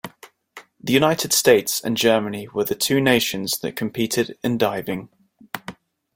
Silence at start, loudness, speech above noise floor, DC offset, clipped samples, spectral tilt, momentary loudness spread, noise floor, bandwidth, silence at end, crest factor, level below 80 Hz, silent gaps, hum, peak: 0.05 s; -20 LUFS; 27 dB; under 0.1%; under 0.1%; -3.5 dB/octave; 17 LU; -47 dBFS; 17 kHz; 0.45 s; 20 dB; -58 dBFS; none; none; -2 dBFS